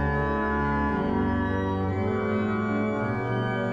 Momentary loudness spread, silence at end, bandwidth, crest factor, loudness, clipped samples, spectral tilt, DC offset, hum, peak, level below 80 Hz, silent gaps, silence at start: 2 LU; 0 s; 7.2 kHz; 10 dB; -26 LUFS; under 0.1%; -8.5 dB/octave; under 0.1%; none; -14 dBFS; -38 dBFS; none; 0 s